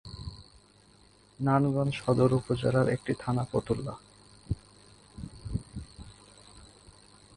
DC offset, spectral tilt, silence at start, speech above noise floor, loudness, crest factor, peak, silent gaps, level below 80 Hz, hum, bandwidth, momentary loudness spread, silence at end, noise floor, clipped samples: under 0.1%; -7.5 dB/octave; 0.05 s; 32 dB; -29 LUFS; 20 dB; -12 dBFS; none; -50 dBFS; none; 11 kHz; 23 LU; 0.7 s; -60 dBFS; under 0.1%